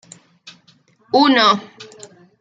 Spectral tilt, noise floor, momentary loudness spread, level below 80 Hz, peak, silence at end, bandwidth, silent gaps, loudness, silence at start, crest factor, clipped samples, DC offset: -3.5 dB/octave; -55 dBFS; 26 LU; -72 dBFS; -2 dBFS; 0.6 s; 9.2 kHz; none; -14 LUFS; 0.45 s; 18 dB; under 0.1%; under 0.1%